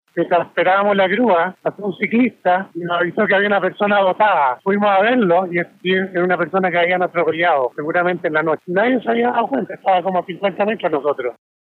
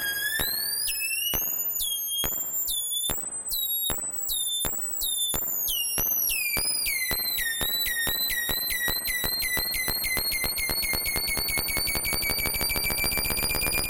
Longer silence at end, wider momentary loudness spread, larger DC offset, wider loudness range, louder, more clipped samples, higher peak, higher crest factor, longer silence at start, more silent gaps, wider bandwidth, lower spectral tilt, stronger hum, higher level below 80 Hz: first, 0.4 s vs 0 s; first, 7 LU vs 2 LU; neither; about the same, 2 LU vs 2 LU; first, -17 LUFS vs -25 LUFS; neither; about the same, -4 dBFS vs -6 dBFS; second, 14 dB vs 22 dB; first, 0.15 s vs 0 s; neither; second, 4.4 kHz vs 17.5 kHz; first, -8 dB/octave vs -0.5 dB/octave; neither; second, -76 dBFS vs -42 dBFS